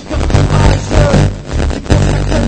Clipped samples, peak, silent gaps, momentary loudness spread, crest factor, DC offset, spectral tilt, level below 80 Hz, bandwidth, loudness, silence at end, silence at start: under 0.1%; 0 dBFS; none; 7 LU; 10 dB; under 0.1%; -6.5 dB/octave; -16 dBFS; 9 kHz; -12 LUFS; 0 s; 0 s